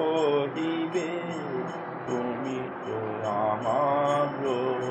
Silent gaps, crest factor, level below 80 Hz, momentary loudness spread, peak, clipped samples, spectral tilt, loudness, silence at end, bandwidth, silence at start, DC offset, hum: none; 14 dB; -70 dBFS; 8 LU; -14 dBFS; under 0.1%; -6 dB/octave; -28 LUFS; 0 s; 9.4 kHz; 0 s; under 0.1%; none